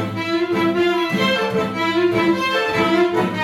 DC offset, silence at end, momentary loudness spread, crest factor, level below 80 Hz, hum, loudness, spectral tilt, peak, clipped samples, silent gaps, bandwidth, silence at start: under 0.1%; 0 s; 3 LU; 12 dB; -56 dBFS; none; -18 LUFS; -5.5 dB/octave; -6 dBFS; under 0.1%; none; 13.5 kHz; 0 s